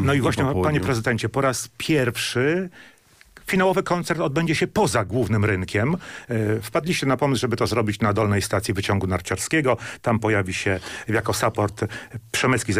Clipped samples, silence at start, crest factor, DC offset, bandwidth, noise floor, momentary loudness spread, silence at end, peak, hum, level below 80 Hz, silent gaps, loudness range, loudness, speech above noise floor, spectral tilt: under 0.1%; 0 s; 14 dB; under 0.1%; 16 kHz; -51 dBFS; 5 LU; 0 s; -10 dBFS; none; -48 dBFS; none; 1 LU; -22 LUFS; 29 dB; -5 dB/octave